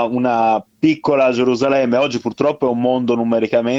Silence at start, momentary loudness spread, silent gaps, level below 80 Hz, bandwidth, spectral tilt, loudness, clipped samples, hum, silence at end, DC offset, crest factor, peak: 0 s; 3 LU; none; -58 dBFS; 7.6 kHz; -6.5 dB/octave; -16 LUFS; under 0.1%; none; 0 s; under 0.1%; 14 dB; -2 dBFS